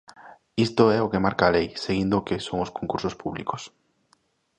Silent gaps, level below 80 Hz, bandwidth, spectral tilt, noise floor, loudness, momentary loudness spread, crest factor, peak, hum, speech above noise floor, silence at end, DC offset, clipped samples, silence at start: none; -50 dBFS; 9.8 kHz; -6 dB/octave; -66 dBFS; -24 LUFS; 12 LU; 22 dB; -2 dBFS; none; 42 dB; 0.9 s; under 0.1%; under 0.1%; 0.2 s